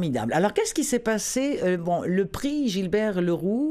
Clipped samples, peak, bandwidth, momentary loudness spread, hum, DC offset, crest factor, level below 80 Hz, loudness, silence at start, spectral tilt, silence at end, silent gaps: under 0.1%; -8 dBFS; 15.5 kHz; 2 LU; none; under 0.1%; 16 dB; -52 dBFS; -25 LUFS; 0 s; -5 dB/octave; 0 s; none